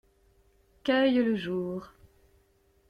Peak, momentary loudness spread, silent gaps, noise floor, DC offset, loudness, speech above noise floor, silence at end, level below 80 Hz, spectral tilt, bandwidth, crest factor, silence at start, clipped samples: -12 dBFS; 13 LU; none; -66 dBFS; under 0.1%; -28 LUFS; 40 dB; 1.05 s; -64 dBFS; -7 dB/octave; 6.6 kHz; 18 dB; 0.85 s; under 0.1%